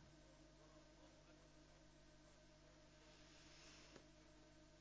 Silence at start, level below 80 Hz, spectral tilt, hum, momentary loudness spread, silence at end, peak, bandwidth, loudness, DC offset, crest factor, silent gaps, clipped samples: 0 s; -74 dBFS; -3.5 dB/octave; 50 Hz at -75 dBFS; 5 LU; 0 s; -46 dBFS; 8 kHz; -67 LUFS; under 0.1%; 22 dB; none; under 0.1%